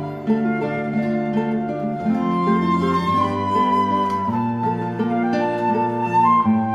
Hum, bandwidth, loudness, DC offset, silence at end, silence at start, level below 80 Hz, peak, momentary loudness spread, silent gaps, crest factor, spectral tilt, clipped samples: none; 8 kHz; -20 LUFS; under 0.1%; 0 s; 0 s; -54 dBFS; -6 dBFS; 6 LU; none; 12 dB; -8 dB/octave; under 0.1%